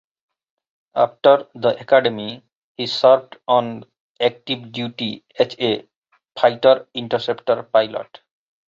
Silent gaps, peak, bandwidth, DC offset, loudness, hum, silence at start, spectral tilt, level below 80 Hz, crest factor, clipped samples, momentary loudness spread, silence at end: 2.55-2.75 s, 4.00-4.15 s, 5.96-6.02 s; -2 dBFS; 7.4 kHz; under 0.1%; -19 LUFS; none; 0.95 s; -5.5 dB/octave; -66 dBFS; 18 dB; under 0.1%; 15 LU; 0.65 s